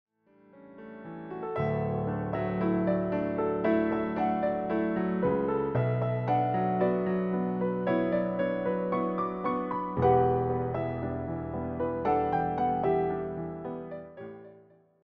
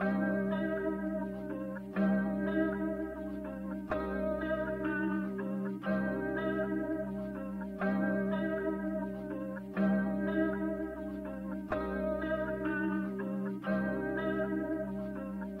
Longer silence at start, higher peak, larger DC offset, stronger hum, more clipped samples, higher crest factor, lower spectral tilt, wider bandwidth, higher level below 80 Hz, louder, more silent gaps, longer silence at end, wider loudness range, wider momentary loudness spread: first, 0.55 s vs 0 s; first, -12 dBFS vs -20 dBFS; neither; neither; neither; about the same, 16 dB vs 14 dB; about the same, -8 dB/octave vs -9 dB/octave; first, 5 kHz vs 4.5 kHz; about the same, -54 dBFS vs -54 dBFS; first, -29 LUFS vs -35 LUFS; neither; first, 0.45 s vs 0 s; about the same, 3 LU vs 2 LU; first, 11 LU vs 8 LU